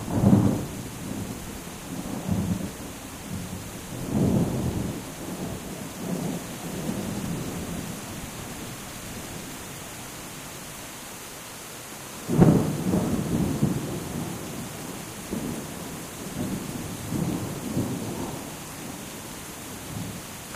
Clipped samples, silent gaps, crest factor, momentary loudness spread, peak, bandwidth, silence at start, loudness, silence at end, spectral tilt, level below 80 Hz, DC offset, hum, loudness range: under 0.1%; none; 26 dB; 13 LU; -4 dBFS; 16 kHz; 0 s; -30 LUFS; 0 s; -5.5 dB/octave; -48 dBFS; under 0.1%; none; 10 LU